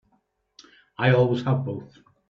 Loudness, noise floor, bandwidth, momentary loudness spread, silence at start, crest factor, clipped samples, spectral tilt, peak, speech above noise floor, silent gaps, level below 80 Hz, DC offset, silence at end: -23 LUFS; -69 dBFS; 6.4 kHz; 17 LU; 1 s; 20 dB; under 0.1%; -8.5 dB/octave; -6 dBFS; 47 dB; none; -60 dBFS; under 0.1%; 0.45 s